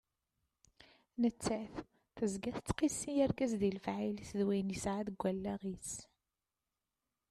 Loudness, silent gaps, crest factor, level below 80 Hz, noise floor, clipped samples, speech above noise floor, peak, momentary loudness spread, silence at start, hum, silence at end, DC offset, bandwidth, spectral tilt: -38 LUFS; none; 18 dB; -62 dBFS; under -90 dBFS; under 0.1%; over 53 dB; -20 dBFS; 11 LU; 1.2 s; none; 1.25 s; under 0.1%; 13.5 kHz; -5.5 dB/octave